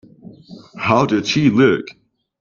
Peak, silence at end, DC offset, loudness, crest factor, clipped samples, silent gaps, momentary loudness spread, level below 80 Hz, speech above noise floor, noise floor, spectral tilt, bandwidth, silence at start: 0 dBFS; 0.5 s; under 0.1%; -16 LUFS; 18 dB; under 0.1%; none; 10 LU; -54 dBFS; 26 dB; -41 dBFS; -6 dB/octave; 7.2 kHz; 0.25 s